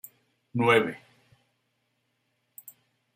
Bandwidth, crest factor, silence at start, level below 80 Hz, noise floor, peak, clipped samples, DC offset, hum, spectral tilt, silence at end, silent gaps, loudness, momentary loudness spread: 16 kHz; 24 dB; 0.55 s; -74 dBFS; -76 dBFS; -8 dBFS; under 0.1%; under 0.1%; none; -5.5 dB/octave; 2.2 s; none; -25 LUFS; 26 LU